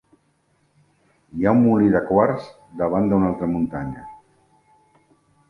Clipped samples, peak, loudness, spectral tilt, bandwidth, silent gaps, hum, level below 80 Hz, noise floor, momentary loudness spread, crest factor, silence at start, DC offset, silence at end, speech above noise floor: under 0.1%; -2 dBFS; -20 LUFS; -10 dB/octave; 5.6 kHz; none; none; -50 dBFS; -64 dBFS; 17 LU; 20 dB; 1.35 s; under 0.1%; 1.35 s; 45 dB